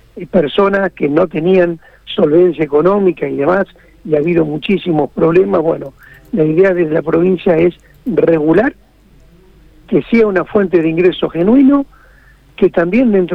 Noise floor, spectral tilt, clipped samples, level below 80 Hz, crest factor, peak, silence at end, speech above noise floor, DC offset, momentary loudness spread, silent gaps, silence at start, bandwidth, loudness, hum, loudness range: -45 dBFS; -9 dB/octave; under 0.1%; -42 dBFS; 12 dB; 0 dBFS; 0 s; 33 dB; under 0.1%; 7 LU; none; 0.15 s; 5.4 kHz; -13 LUFS; none; 2 LU